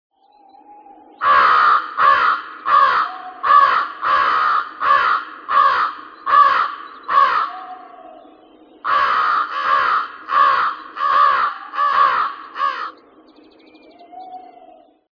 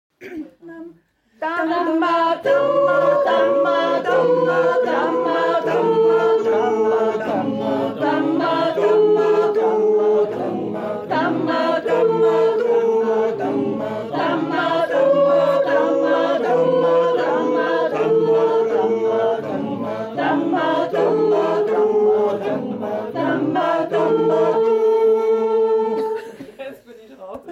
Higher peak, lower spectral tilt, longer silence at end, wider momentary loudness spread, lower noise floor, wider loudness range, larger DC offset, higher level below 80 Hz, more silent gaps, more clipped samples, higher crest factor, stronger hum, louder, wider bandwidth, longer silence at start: first, -2 dBFS vs -6 dBFS; second, -2.5 dB/octave vs -6.5 dB/octave; first, 0.75 s vs 0 s; first, 12 LU vs 9 LU; second, -49 dBFS vs -53 dBFS; first, 5 LU vs 2 LU; neither; first, -60 dBFS vs -66 dBFS; neither; neither; about the same, 16 dB vs 12 dB; neither; about the same, -16 LUFS vs -18 LUFS; second, 5.4 kHz vs 7.6 kHz; first, 1.2 s vs 0.2 s